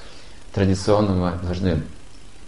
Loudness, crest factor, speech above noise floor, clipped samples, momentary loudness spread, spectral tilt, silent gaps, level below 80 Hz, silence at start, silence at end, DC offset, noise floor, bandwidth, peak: -22 LUFS; 18 dB; 23 dB; under 0.1%; 10 LU; -7 dB/octave; none; -36 dBFS; 0 s; 0 s; 2%; -43 dBFS; 11.5 kHz; -6 dBFS